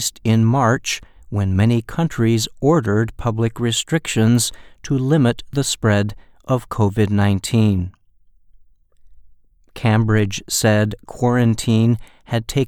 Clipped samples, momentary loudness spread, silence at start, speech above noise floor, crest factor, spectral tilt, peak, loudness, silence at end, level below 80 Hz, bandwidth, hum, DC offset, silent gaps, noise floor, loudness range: under 0.1%; 8 LU; 0 s; 35 dB; 16 dB; -5.5 dB/octave; -2 dBFS; -18 LUFS; 0 s; -42 dBFS; 16 kHz; none; under 0.1%; none; -52 dBFS; 3 LU